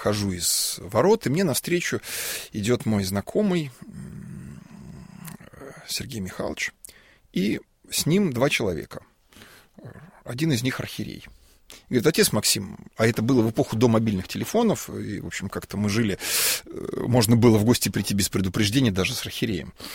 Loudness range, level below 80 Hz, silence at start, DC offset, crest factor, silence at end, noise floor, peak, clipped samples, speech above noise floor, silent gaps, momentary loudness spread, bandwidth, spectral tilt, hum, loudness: 10 LU; -52 dBFS; 0 s; under 0.1%; 20 dB; 0 s; -51 dBFS; -4 dBFS; under 0.1%; 27 dB; none; 20 LU; 16.5 kHz; -4.5 dB/octave; none; -24 LUFS